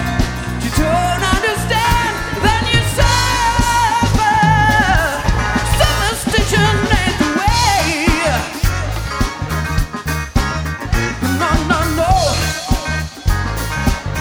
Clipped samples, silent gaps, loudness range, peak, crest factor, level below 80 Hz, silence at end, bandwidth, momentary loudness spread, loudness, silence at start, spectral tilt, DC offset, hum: under 0.1%; none; 5 LU; 0 dBFS; 16 dB; -22 dBFS; 0 s; over 20 kHz; 7 LU; -15 LUFS; 0 s; -4 dB/octave; under 0.1%; none